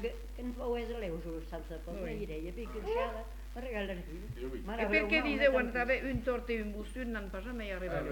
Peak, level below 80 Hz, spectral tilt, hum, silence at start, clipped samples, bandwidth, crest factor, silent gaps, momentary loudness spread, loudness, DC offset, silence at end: -16 dBFS; -44 dBFS; -6 dB/octave; none; 0 s; under 0.1%; 19 kHz; 20 dB; none; 15 LU; -36 LUFS; under 0.1%; 0 s